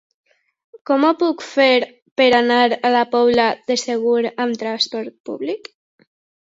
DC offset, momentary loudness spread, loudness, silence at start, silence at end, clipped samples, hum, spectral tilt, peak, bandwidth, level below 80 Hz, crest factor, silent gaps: under 0.1%; 12 LU; -17 LUFS; 0.9 s; 0.9 s; under 0.1%; none; -3 dB/octave; -2 dBFS; 8 kHz; -64 dBFS; 16 dB; 2.02-2.16 s, 5.20-5.24 s